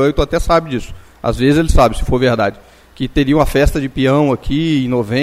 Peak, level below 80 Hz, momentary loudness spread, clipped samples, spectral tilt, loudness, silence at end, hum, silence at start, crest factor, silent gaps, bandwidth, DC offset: 0 dBFS; -22 dBFS; 8 LU; under 0.1%; -6.5 dB/octave; -15 LUFS; 0 s; none; 0 s; 14 dB; none; 15.5 kHz; under 0.1%